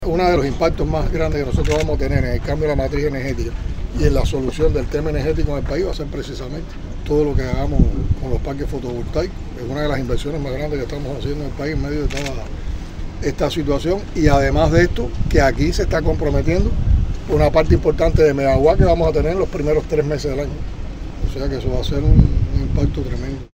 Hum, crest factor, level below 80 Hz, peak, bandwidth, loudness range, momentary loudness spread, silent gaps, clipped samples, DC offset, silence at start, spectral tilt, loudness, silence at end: none; 18 dB; -22 dBFS; 0 dBFS; 16 kHz; 7 LU; 12 LU; none; under 0.1%; under 0.1%; 0 s; -7 dB/octave; -19 LUFS; 0.05 s